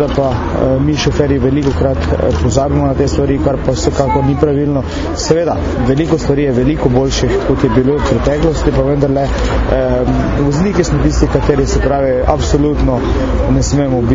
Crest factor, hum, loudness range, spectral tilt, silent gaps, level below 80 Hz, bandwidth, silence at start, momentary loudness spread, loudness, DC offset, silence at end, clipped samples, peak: 12 dB; none; 1 LU; -6.5 dB/octave; none; -20 dBFS; 7.8 kHz; 0 s; 2 LU; -13 LUFS; under 0.1%; 0 s; under 0.1%; 0 dBFS